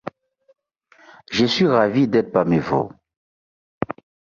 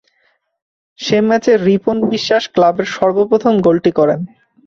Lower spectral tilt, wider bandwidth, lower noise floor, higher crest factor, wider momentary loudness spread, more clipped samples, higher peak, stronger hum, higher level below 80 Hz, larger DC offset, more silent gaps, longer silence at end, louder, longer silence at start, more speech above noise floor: about the same, -6.5 dB/octave vs -6 dB/octave; about the same, 7.4 kHz vs 7.6 kHz; second, -55 dBFS vs -61 dBFS; first, 18 dB vs 12 dB; first, 14 LU vs 4 LU; neither; about the same, -4 dBFS vs -2 dBFS; neither; about the same, -54 dBFS vs -54 dBFS; neither; first, 3.17-3.81 s vs none; about the same, 0.4 s vs 0.4 s; second, -20 LUFS vs -14 LUFS; second, 0.05 s vs 1 s; second, 37 dB vs 48 dB